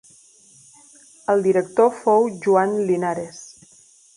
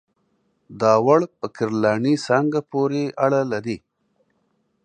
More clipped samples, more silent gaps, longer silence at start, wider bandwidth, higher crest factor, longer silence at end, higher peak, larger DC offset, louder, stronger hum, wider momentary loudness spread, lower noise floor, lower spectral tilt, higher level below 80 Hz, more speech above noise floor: neither; neither; first, 1.3 s vs 0.7 s; first, 11 kHz vs 9.6 kHz; about the same, 18 dB vs 20 dB; second, 0.7 s vs 1.05 s; about the same, -4 dBFS vs -2 dBFS; neither; about the same, -19 LUFS vs -20 LUFS; neither; first, 13 LU vs 10 LU; second, -52 dBFS vs -68 dBFS; about the same, -6.5 dB/octave vs -6.5 dB/octave; about the same, -68 dBFS vs -64 dBFS; second, 34 dB vs 48 dB